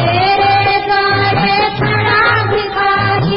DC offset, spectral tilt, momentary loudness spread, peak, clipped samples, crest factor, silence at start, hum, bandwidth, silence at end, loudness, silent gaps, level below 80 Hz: under 0.1%; -10 dB/octave; 3 LU; -2 dBFS; under 0.1%; 10 dB; 0 s; none; 5.8 kHz; 0 s; -12 LUFS; none; -36 dBFS